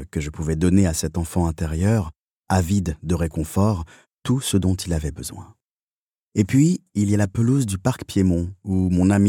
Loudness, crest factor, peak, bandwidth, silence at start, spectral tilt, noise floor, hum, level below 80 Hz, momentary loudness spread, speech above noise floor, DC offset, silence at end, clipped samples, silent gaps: -22 LUFS; 18 dB; -4 dBFS; 17 kHz; 0 s; -6.5 dB/octave; under -90 dBFS; none; -38 dBFS; 11 LU; over 70 dB; under 0.1%; 0 s; under 0.1%; 2.19-2.43 s, 4.13-4.17 s, 5.65-6.27 s